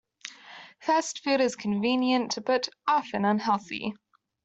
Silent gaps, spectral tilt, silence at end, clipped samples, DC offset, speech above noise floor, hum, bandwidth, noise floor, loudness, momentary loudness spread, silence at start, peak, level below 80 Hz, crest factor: none; -4 dB/octave; 0.5 s; under 0.1%; under 0.1%; 22 dB; none; 8.2 kHz; -49 dBFS; -27 LUFS; 17 LU; 0.25 s; -12 dBFS; -70 dBFS; 16 dB